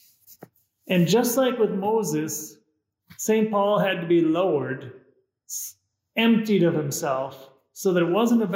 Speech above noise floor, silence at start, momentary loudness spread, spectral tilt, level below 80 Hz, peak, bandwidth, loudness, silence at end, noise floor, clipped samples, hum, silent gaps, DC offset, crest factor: 49 dB; 0.3 s; 12 LU; -5 dB/octave; -74 dBFS; -8 dBFS; 16 kHz; -23 LUFS; 0 s; -71 dBFS; under 0.1%; none; none; under 0.1%; 16 dB